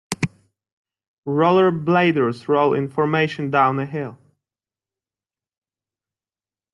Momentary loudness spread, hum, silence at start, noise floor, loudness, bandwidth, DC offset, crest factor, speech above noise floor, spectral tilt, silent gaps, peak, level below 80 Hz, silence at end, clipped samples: 11 LU; none; 0.1 s; under -90 dBFS; -19 LUFS; 12 kHz; under 0.1%; 18 dB; over 72 dB; -6.5 dB/octave; 0.73-0.85 s, 1.08-1.23 s; -4 dBFS; -66 dBFS; 2.6 s; under 0.1%